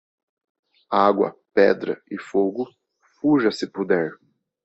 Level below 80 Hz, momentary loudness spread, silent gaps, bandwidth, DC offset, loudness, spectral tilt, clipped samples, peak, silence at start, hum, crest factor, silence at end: -66 dBFS; 12 LU; none; 8.2 kHz; under 0.1%; -22 LUFS; -6.5 dB/octave; under 0.1%; -2 dBFS; 0.9 s; none; 20 dB; 0.5 s